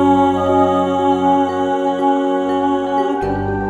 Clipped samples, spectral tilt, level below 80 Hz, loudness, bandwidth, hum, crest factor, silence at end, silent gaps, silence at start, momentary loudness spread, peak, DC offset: under 0.1%; -7 dB/octave; -42 dBFS; -16 LUFS; 8.6 kHz; none; 14 dB; 0 s; none; 0 s; 4 LU; -2 dBFS; under 0.1%